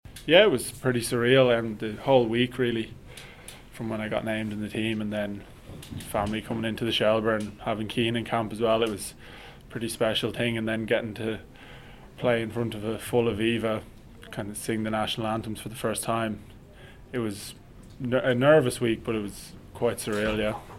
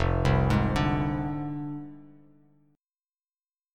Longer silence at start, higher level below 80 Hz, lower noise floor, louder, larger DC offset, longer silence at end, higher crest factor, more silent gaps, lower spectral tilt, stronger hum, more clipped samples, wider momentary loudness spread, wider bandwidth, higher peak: about the same, 0.05 s vs 0 s; second, -52 dBFS vs -38 dBFS; second, -48 dBFS vs under -90 dBFS; about the same, -27 LUFS vs -27 LUFS; neither; second, 0 s vs 1.7 s; about the same, 24 dB vs 20 dB; neither; second, -5 dB/octave vs -7.5 dB/octave; neither; neither; first, 19 LU vs 14 LU; first, 16.5 kHz vs 10.5 kHz; first, -4 dBFS vs -10 dBFS